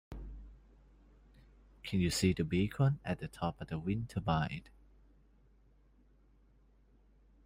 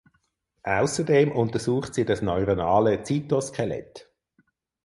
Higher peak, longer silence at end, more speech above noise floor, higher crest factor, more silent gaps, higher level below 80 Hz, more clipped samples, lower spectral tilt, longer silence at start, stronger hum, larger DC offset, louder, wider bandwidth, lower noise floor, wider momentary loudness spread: second, -18 dBFS vs -8 dBFS; first, 2.8 s vs 0.85 s; second, 32 dB vs 48 dB; about the same, 22 dB vs 18 dB; neither; about the same, -54 dBFS vs -50 dBFS; neither; about the same, -6 dB/octave vs -6 dB/octave; second, 0.1 s vs 0.65 s; neither; neither; second, -35 LUFS vs -24 LUFS; first, 16 kHz vs 11.5 kHz; second, -66 dBFS vs -71 dBFS; first, 18 LU vs 9 LU